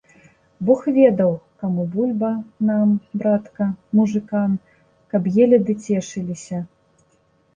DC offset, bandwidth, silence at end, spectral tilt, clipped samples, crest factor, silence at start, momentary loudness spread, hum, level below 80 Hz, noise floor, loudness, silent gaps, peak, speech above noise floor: under 0.1%; 9 kHz; 0.9 s; -8.5 dB/octave; under 0.1%; 18 dB; 0.6 s; 13 LU; none; -60 dBFS; -61 dBFS; -20 LUFS; none; -2 dBFS; 42 dB